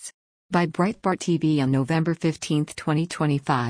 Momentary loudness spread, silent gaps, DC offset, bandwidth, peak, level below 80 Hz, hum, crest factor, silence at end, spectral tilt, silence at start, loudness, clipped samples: 4 LU; 0.14-0.49 s; under 0.1%; 10.5 kHz; -8 dBFS; -60 dBFS; none; 16 dB; 0 s; -6.5 dB/octave; 0 s; -24 LUFS; under 0.1%